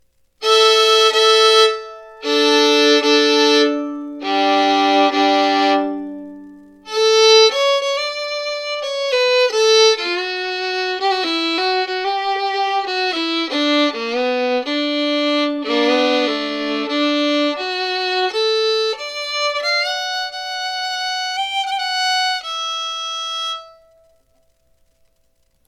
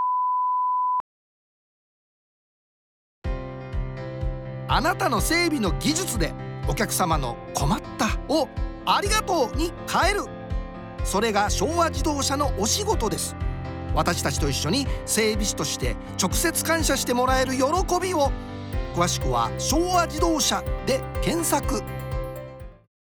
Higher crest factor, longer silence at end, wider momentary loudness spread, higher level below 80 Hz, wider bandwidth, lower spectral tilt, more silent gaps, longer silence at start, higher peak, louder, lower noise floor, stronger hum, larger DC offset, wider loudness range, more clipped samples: about the same, 16 dB vs 18 dB; first, 2 s vs 0.3 s; about the same, 11 LU vs 11 LU; second, -66 dBFS vs -34 dBFS; second, 15.5 kHz vs over 20 kHz; second, -0.5 dB/octave vs -4 dB/octave; second, none vs 1.00-3.22 s; first, 0.4 s vs 0 s; first, -2 dBFS vs -8 dBFS; first, -16 LUFS vs -24 LUFS; second, -61 dBFS vs under -90 dBFS; neither; neither; about the same, 6 LU vs 6 LU; neither